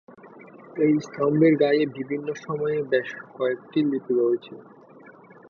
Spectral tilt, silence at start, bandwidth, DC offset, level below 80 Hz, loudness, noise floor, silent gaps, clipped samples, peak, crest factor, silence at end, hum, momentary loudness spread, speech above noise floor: -7.5 dB/octave; 0.1 s; 7 kHz; under 0.1%; -72 dBFS; -24 LUFS; -49 dBFS; none; under 0.1%; -8 dBFS; 16 dB; 0.4 s; none; 11 LU; 25 dB